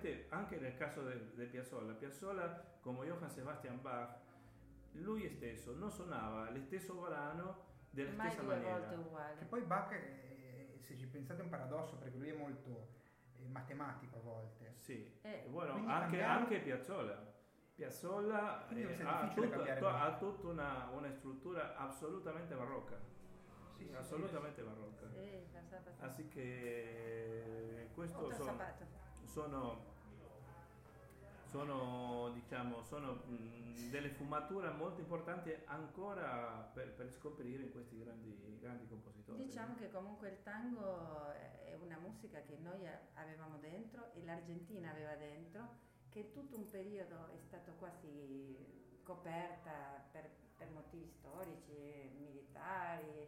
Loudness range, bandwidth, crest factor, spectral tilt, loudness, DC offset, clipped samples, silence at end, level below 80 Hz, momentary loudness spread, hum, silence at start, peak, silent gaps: 11 LU; 16 kHz; 24 dB; -6.5 dB/octave; -47 LUFS; under 0.1%; under 0.1%; 0 s; -70 dBFS; 16 LU; none; 0 s; -24 dBFS; none